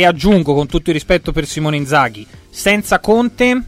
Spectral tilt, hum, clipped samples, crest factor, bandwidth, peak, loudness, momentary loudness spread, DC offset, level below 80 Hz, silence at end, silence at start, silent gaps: -5 dB/octave; none; under 0.1%; 14 dB; 16 kHz; 0 dBFS; -14 LUFS; 6 LU; under 0.1%; -30 dBFS; 0 s; 0 s; none